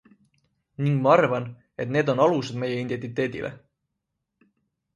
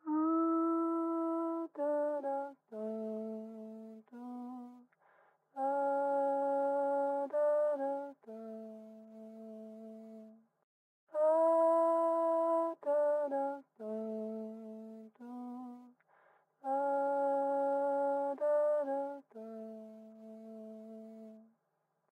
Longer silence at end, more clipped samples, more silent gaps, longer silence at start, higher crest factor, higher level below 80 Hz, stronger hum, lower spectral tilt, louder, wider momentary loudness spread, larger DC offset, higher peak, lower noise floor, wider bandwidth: first, 1.4 s vs 0.75 s; neither; second, none vs 10.64-11.07 s; first, 0.8 s vs 0.05 s; first, 22 dB vs 14 dB; first, -64 dBFS vs under -90 dBFS; neither; about the same, -7.5 dB/octave vs -7.5 dB/octave; first, -24 LUFS vs -34 LUFS; second, 15 LU vs 20 LU; neither; first, -4 dBFS vs -22 dBFS; about the same, -81 dBFS vs -82 dBFS; about the same, 10.5 kHz vs 10 kHz